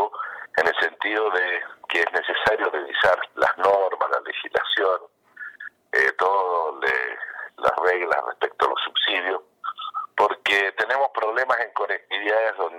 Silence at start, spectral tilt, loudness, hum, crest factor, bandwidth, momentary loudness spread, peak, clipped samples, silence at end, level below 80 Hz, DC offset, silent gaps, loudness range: 0 s; -2.5 dB/octave; -22 LUFS; none; 16 dB; 15.5 kHz; 10 LU; -8 dBFS; under 0.1%; 0 s; -64 dBFS; under 0.1%; none; 2 LU